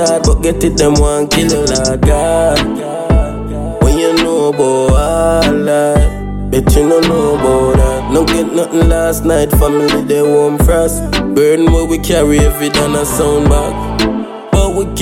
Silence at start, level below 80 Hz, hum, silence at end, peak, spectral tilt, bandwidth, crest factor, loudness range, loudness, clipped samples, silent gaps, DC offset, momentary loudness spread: 0 s; -18 dBFS; none; 0 s; 0 dBFS; -5.5 dB/octave; 17 kHz; 10 dB; 1 LU; -12 LUFS; under 0.1%; none; under 0.1%; 5 LU